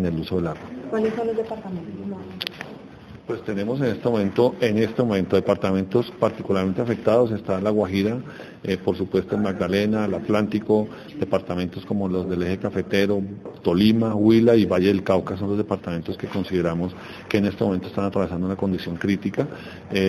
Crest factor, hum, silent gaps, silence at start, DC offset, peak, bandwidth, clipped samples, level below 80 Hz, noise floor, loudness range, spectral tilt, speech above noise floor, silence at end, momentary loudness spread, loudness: 18 dB; none; none; 0 s; under 0.1%; -4 dBFS; 14 kHz; under 0.1%; -54 dBFS; -42 dBFS; 5 LU; -7.5 dB/octave; 20 dB; 0 s; 12 LU; -23 LUFS